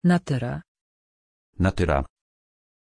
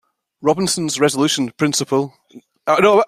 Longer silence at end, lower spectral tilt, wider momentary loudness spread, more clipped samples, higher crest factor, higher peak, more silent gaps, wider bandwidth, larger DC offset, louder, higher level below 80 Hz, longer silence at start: first, 0.85 s vs 0 s; first, -7.5 dB/octave vs -4 dB/octave; first, 14 LU vs 7 LU; neither; about the same, 18 dB vs 16 dB; second, -8 dBFS vs -2 dBFS; first, 0.68-0.75 s, 0.81-1.53 s vs none; second, 10.5 kHz vs 15.5 kHz; neither; second, -25 LUFS vs -18 LUFS; first, -38 dBFS vs -58 dBFS; second, 0.05 s vs 0.4 s